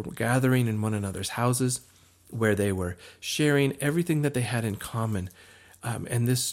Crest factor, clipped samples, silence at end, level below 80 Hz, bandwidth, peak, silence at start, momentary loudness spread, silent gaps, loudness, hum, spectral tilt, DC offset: 18 dB; under 0.1%; 0 s; -60 dBFS; 16.5 kHz; -10 dBFS; 0 s; 11 LU; none; -27 LUFS; none; -5 dB/octave; under 0.1%